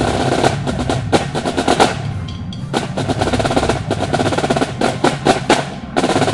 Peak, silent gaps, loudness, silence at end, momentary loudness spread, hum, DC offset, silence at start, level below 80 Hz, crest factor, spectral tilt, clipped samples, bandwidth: 0 dBFS; none; -17 LUFS; 0 s; 7 LU; none; under 0.1%; 0 s; -34 dBFS; 16 dB; -5 dB/octave; under 0.1%; 11.5 kHz